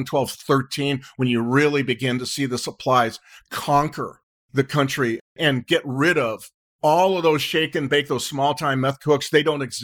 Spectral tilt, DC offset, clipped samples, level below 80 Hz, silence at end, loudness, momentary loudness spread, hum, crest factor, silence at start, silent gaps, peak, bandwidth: -5 dB/octave; under 0.1%; under 0.1%; -58 dBFS; 0 s; -21 LUFS; 7 LU; none; 18 dB; 0 s; 4.23-4.49 s, 5.21-5.36 s, 6.54-6.79 s; -2 dBFS; 19.5 kHz